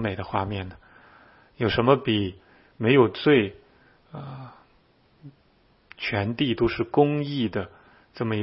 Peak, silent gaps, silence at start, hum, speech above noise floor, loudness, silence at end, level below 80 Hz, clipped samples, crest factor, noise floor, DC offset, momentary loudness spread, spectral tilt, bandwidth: -4 dBFS; none; 0 s; none; 38 dB; -24 LUFS; 0 s; -52 dBFS; under 0.1%; 22 dB; -61 dBFS; under 0.1%; 21 LU; -11 dB/octave; 5.8 kHz